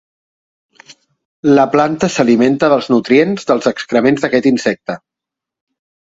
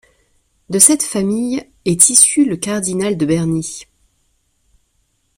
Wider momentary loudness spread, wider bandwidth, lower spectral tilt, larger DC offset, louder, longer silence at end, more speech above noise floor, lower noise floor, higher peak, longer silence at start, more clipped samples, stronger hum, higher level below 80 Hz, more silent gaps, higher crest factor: second, 8 LU vs 14 LU; second, 8 kHz vs 16 kHz; first, -5.5 dB/octave vs -3.5 dB/octave; neither; about the same, -13 LUFS vs -13 LUFS; second, 1.15 s vs 1.55 s; first, 72 dB vs 49 dB; first, -84 dBFS vs -63 dBFS; about the same, 0 dBFS vs 0 dBFS; first, 0.9 s vs 0.7 s; second, under 0.1% vs 0.2%; neither; about the same, -54 dBFS vs -52 dBFS; first, 1.25-1.43 s vs none; about the same, 14 dB vs 16 dB